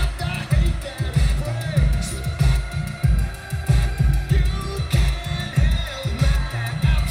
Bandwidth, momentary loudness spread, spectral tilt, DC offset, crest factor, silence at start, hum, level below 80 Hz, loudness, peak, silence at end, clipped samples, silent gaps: 15 kHz; 6 LU; -6 dB/octave; under 0.1%; 14 dB; 0 s; none; -22 dBFS; -22 LUFS; -6 dBFS; 0 s; under 0.1%; none